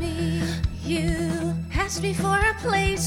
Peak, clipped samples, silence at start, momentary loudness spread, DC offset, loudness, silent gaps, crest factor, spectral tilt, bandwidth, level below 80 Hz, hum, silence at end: -10 dBFS; under 0.1%; 0 s; 6 LU; under 0.1%; -25 LUFS; none; 14 dB; -5 dB/octave; 16 kHz; -34 dBFS; none; 0 s